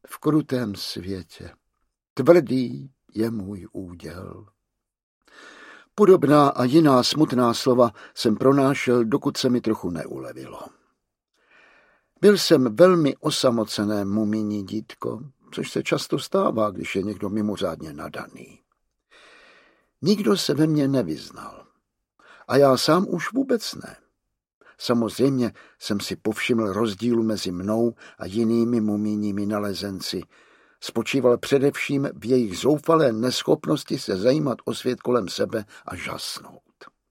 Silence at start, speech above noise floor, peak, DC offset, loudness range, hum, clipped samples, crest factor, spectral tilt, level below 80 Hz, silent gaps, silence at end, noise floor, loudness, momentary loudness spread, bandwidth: 0.1 s; 55 dB; -2 dBFS; under 0.1%; 7 LU; none; under 0.1%; 22 dB; -5.5 dB/octave; -62 dBFS; 2.10-2.16 s, 5.03-5.21 s, 24.53-24.61 s; 0.25 s; -77 dBFS; -22 LUFS; 18 LU; 16.5 kHz